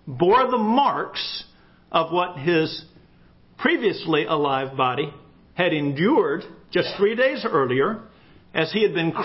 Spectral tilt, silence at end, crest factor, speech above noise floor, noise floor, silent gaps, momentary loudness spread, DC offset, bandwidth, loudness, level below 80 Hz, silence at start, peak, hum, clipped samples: -9.5 dB/octave; 0 s; 18 dB; 32 dB; -53 dBFS; none; 9 LU; under 0.1%; 5.8 kHz; -22 LUFS; -60 dBFS; 0.05 s; -4 dBFS; none; under 0.1%